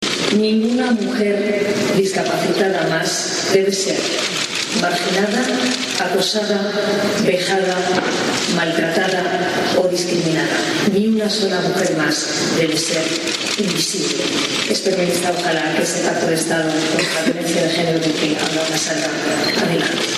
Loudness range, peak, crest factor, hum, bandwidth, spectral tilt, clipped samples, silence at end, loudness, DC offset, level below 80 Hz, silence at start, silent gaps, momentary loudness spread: 0 LU; -2 dBFS; 16 dB; none; 14 kHz; -3.5 dB/octave; under 0.1%; 0 s; -17 LUFS; under 0.1%; -58 dBFS; 0 s; none; 2 LU